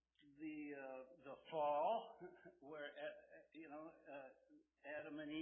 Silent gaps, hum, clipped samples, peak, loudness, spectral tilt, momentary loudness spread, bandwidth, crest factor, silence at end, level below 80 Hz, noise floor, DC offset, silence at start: none; none; under 0.1%; -30 dBFS; -49 LUFS; 0 dB/octave; 19 LU; 3.5 kHz; 18 dB; 0 s; -88 dBFS; -73 dBFS; under 0.1%; 0.2 s